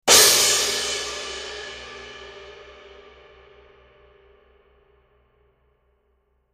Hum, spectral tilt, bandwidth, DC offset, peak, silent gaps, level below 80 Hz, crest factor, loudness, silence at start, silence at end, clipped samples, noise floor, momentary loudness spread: 60 Hz at -80 dBFS; 1 dB/octave; 15.5 kHz; under 0.1%; 0 dBFS; none; -54 dBFS; 24 dB; -17 LUFS; 0.05 s; 3.85 s; under 0.1%; -67 dBFS; 28 LU